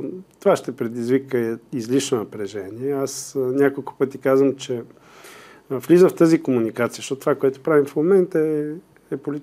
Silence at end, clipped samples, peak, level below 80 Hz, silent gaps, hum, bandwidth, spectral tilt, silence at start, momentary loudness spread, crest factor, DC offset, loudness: 0 s; under 0.1%; -4 dBFS; -70 dBFS; none; none; 15.5 kHz; -6 dB/octave; 0 s; 13 LU; 16 dB; under 0.1%; -21 LUFS